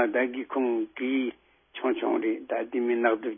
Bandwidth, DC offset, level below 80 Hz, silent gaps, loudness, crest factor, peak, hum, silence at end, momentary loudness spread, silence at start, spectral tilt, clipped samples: 3.7 kHz; under 0.1%; -76 dBFS; none; -28 LUFS; 18 dB; -10 dBFS; none; 0 s; 6 LU; 0 s; -8.5 dB/octave; under 0.1%